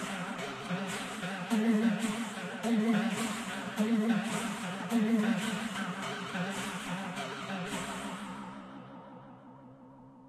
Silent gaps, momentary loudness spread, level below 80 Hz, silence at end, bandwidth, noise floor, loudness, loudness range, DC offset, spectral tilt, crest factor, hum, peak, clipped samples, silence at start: none; 19 LU; -70 dBFS; 0 s; 14 kHz; -54 dBFS; -33 LUFS; 8 LU; under 0.1%; -5 dB/octave; 16 dB; none; -18 dBFS; under 0.1%; 0 s